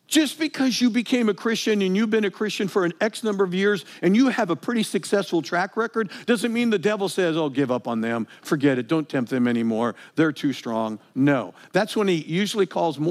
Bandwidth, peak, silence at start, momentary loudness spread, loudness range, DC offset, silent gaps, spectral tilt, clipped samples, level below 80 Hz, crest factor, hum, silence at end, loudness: 15.5 kHz; -6 dBFS; 0.1 s; 5 LU; 2 LU; under 0.1%; none; -5 dB/octave; under 0.1%; -82 dBFS; 16 dB; none; 0 s; -23 LUFS